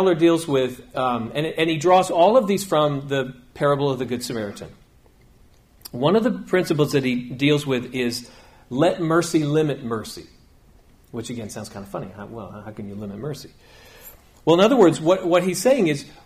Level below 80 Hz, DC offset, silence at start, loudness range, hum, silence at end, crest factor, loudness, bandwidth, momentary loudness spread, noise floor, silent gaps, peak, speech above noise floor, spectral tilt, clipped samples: -54 dBFS; under 0.1%; 0 s; 14 LU; none; 0.15 s; 18 dB; -20 LUFS; 15.5 kHz; 18 LU; -53 dBFS; none; -4 dBFS; 32 dB; -5.5 dB/octave; under 0.1%